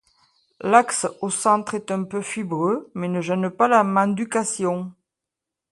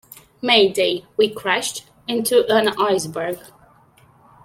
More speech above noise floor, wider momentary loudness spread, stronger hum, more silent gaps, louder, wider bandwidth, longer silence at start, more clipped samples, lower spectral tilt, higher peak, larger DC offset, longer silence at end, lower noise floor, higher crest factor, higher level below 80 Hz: first, 64 dB vs 34 dB; second, 10 LU vs 13 LU; neither; neither; second, -22 LUFS vs -19 LUFS; second, 11.5 kHz vs 16.5 kHz; first, 0.6 s vs 0.45 s; neither; first, -5 dB/octave vs -2.5 dB/octave; about the same, 0 dBFS vs -2 dBFS; neither; second, 0.8 s vs 1 s; first, -86 dBFS vs -53 dBFS; about the same, 22 dB vs 20 dB; second, -68 dBFS vs -62 dBFS